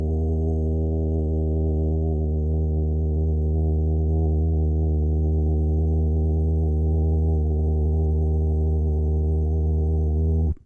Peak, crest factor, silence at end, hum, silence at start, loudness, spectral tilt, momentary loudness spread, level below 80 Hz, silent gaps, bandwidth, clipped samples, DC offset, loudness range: -14 dBFS; 6 dB; 0.1 s; none; 0 s; -23 LUFS; -13.5 dB/octave; 2 LU; -26 dBFS; none; 1 kHz; under 0.1%; under 0.1%; 1 LU